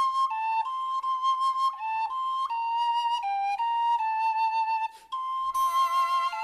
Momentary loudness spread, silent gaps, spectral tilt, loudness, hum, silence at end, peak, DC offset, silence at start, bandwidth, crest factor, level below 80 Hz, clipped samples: 5 LU; none; 2 dB/octave; -27 LUFS; none; 0 s; -16 dBFS; under 0.1%; 0 s; 13 kHz; 10 dB; -72 dBFS; under 0.1%